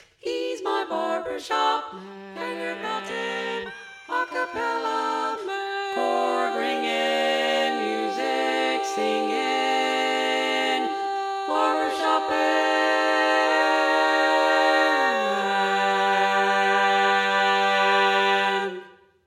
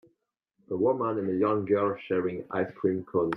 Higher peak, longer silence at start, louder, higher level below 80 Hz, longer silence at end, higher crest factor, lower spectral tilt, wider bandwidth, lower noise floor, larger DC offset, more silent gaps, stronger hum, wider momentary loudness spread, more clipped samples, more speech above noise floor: first, -8 dBFS vs -12 dBFS; second, 0.25 s vs 0.7 s; first, -23 LUFS vs -28 LUFS; about the same, -72 dBFS vs -70 dBFS; first, 0.35 s vs 0 s; about the same, 14 dB vs 16 dB; second, -2.5 dB/octave vs -9.5 dB/octave; first, 15 kHz vs 4.4 kHz; second, -44 dBFS vs -77 dBFS; neither; neither; neither; first, 10 LU vs 6 LU; neither; second, 17 dB vs 50 dB